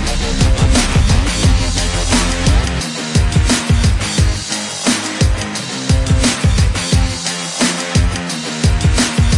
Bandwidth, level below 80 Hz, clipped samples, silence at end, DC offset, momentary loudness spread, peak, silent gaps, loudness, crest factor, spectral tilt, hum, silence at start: 11.5 kHz; -18 dBFS; under 0.1%; 0 s; under 0.1%; 6 LU; -2 dBFS; none; -15 LUFS; 12 dB; -4 dB/octave; none; 0 s